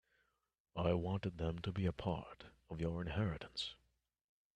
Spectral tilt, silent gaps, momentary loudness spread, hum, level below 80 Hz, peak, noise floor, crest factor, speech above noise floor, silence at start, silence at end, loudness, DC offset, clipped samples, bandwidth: -7 dB/octave; none; 12 LU; none; -60 dBFS; -22 dBFS; -82 dBFS; 20 dB; 41 dB; 0.75 s; 0.85 s; -41 LUFS; under 0.1%; under 0.1%; 9.6 kHz